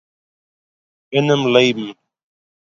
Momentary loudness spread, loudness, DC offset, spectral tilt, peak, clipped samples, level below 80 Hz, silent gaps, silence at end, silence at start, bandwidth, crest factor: 13 LU; -16 LUFS; under 0.1%; -5.5 dB/octave; 0 dBFS; under 0.1%; -66 dBFS; none; 0.85 s; 1.1 s; 7.4 kHz; 20 dB